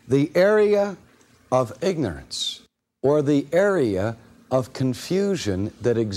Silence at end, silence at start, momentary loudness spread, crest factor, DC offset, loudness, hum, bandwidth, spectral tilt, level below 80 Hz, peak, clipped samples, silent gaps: 0 s; 0.05 s; 10 LU; 16 dB; under 0.1%; -22 LUFS; none; 14.5 kHz; -6 dB/octave; -54 dBFS; -6 dBFS; under 0.1%; none